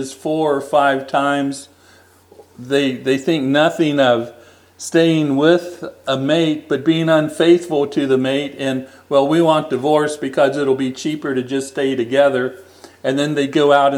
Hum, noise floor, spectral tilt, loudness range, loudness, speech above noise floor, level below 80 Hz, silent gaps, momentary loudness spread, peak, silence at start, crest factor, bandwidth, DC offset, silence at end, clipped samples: none; -49 dBFS; -5.5 dB/octave; 3 LU; -17 LUFS; 33 dB; -68 dBFS; none; 8 LU; 0 dBFS; 0 s; 16 dB; 15 kHz; under 0.1%; 0 s; under 0.1%